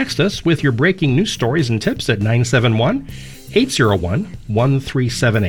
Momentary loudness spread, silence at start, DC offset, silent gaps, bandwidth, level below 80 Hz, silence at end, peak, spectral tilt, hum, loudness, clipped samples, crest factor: 7 LU; 0 s; 0.8%; none; 17.5 kHz; -40 dBFS; 0 s; -2 dBFS; -5.5 dB/octave; none; -17 LUFS; under 0.1%; 14 dB